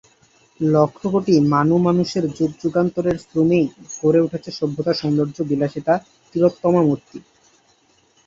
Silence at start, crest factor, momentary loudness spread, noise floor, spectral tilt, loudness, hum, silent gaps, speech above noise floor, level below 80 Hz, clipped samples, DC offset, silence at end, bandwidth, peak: 0.6 s; 16 dB; 7 LU; -58 dBFS; -7.5 dB/octave; -19 LUFS; none; none; 40 dB; -56 dBFS; under 0.1%; under 0.1%; 1.05 s; 7.8 kHz; -2 dBFS